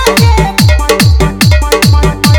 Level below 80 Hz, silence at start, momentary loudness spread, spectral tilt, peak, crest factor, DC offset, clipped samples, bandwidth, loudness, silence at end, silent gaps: -12 dBFS; 0 s; 1 LU; -5 dB/octave; 0 dBFS; 6 dB; under 0.1%; 1%; over 20 kHz; -8 LUFS; 0 s; none